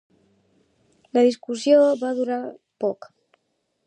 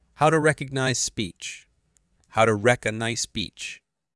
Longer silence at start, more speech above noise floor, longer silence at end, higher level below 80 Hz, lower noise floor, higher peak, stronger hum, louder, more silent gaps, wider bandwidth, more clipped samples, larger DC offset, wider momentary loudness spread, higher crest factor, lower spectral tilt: first, 1.15 s vs 0.2 s; first, 53 dB vs 43 dB; first, 0.95 s vs 0.4 s; second, -80 dBFS vs -56 dBFS; first, -73 dBFS vs -67 dBFS; about the same, -6 dBFS vs -4 dBFS; neither; first, -21 LUFS vs -24 LUFS; neither; second, 10 kHz vs 12 kHz; neither; neither; second, 13 LU vs 16 LU; about the same, 18 dB vs 20 dB; about the same, -4.5 dB/octave vs -4 dB/octave